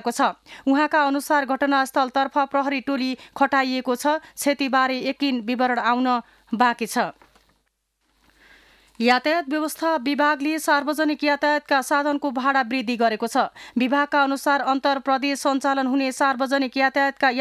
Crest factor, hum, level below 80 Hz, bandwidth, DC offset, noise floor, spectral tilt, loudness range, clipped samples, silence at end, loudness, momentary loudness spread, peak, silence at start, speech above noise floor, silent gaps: 16 dB; none; -68 dBFS; 15 kHz; under 0.1%; -72 dBFS; -3 dB/octave; 4 LU; under 0.1%; 0 s; -22 LUFS; 4 LU; -6 dBFS; 0.05 s; 50 dB; none